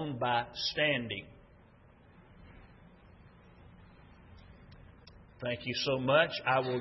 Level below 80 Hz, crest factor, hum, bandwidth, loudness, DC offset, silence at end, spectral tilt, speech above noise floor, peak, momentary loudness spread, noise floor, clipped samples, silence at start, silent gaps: -62 dBFS; 22 dB; none; 5.8 kHz; -31 LUFS; under 0.1%; 0 s; -2.5 dB/octave; 28 dB; -14 dBFS; 12 LU; -60 dBFS; under 0.1%; 0 s; none